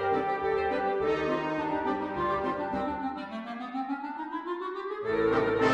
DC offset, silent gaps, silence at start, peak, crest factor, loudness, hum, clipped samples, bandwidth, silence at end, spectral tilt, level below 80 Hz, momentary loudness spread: under 0.1%; none; 0 s; -12 dBFS; 18 dB; -30 LUFS; none; under 0.1%; 8.4 kHz; 0 s; -6.5 dB/octave; -56 dBFS; 9 LU